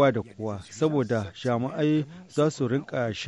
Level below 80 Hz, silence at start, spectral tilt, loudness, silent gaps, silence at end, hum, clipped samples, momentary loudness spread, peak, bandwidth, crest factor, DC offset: -62 dBFS; 0 s; -6.5 dB/octave; -27 LUFS; none; 0 s; none; under 0.1%; 8 LU; -10 dBFS; 11 kHz; 16 dB; under 0.1%